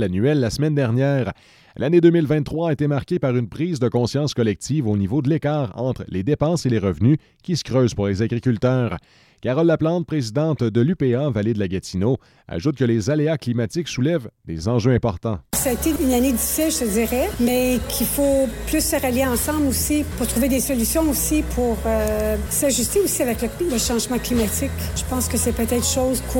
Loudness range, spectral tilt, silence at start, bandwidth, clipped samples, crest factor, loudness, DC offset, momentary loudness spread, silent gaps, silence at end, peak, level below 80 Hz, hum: 2 LU; -5.5 dB/octave; 0 s; 17 kHz; under 0.1%; 18 dB; -20 LUFS; under 0.1%; 6 LU; none; 0 s; -2 dBFS; -36 dBFS; none